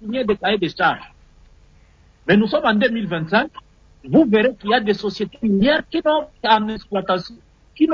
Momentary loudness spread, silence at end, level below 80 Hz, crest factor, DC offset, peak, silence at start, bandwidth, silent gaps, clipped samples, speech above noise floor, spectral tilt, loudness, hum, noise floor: 8 LU; 0 s; -50 dBFS; 16 dB; under 0.1%; -4 dBFS; 0 s; 7 kHz; none; under 0.1%; 33 dB; -7 dB/octave; -19 LUFS; none; -51 dBFS